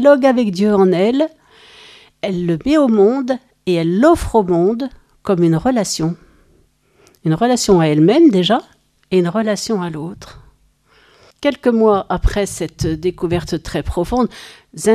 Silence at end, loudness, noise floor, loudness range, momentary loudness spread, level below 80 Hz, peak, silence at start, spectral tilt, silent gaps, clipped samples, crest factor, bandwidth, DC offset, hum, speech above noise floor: 0 s; -16 LUFS; -55 dBFS; 4 LU; 11 LU; -32 dBFS; 0 dBFS; 0 s; -6 dB/octave; none; under 0.1%; 16 dB; 14.5 kHz; under 0.1%; none; 40 dB